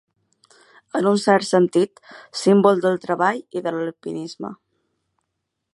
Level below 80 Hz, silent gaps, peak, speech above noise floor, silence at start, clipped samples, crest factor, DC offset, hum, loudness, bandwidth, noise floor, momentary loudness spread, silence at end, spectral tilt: -72 dBFS; none; -2 dBFS; 58 dB; 0.95 s; under 0.1%; 20 dB; under 0.1%; none; -20 LUFS; 11.5 kHz; -78 dBFS; 15 LU; 1.2 s; -5.5 dB/octave